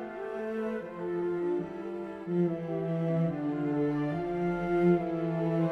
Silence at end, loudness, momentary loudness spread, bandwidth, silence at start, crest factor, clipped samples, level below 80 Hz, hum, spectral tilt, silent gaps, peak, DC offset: 0 s; -31 LUFS; 9 LU; 6 kHz; 0 s; 16 dB; under 0.1%; -60 dBFS; none; -10 dB/octave; none; -14 dBFS; under 0.1%